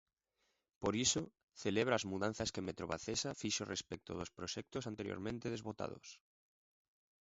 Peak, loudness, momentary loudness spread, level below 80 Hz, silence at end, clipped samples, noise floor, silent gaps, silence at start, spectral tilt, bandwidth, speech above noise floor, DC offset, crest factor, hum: -18 dBFS; -40 LUFS; 11 LU; -64 dBFS; 1.05 s; under 0.1%; -84 dBFS; 1.43-1.48 s; 0.8 s; -3.5 dB/octave; 7.6 kHz; 43 dB; under 0.1%; 24 dB; none